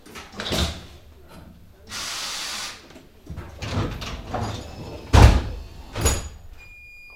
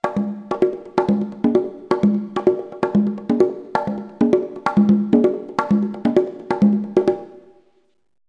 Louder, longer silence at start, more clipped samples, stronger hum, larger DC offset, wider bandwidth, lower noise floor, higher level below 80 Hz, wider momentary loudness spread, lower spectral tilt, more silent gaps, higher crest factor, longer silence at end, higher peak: second, -24 LUFS vs -20 LUFS; about the same, 0.05 s vs 0.05 s; neither; neither; neither; first, 16.5 kHz vs 7.4 kHz; second, -46 dBFS vs -63 dBFS; first, -28 dBFS vs -56 dBFS; first, 26 LU vs 7 LU; second, -4.5 dB/octave vs -8.5 dB/octave; neither; first, 24 dB vs 18 dB; second, 0 s vs 0.9 s; about the same, 0 dBFS vs 0 dBFS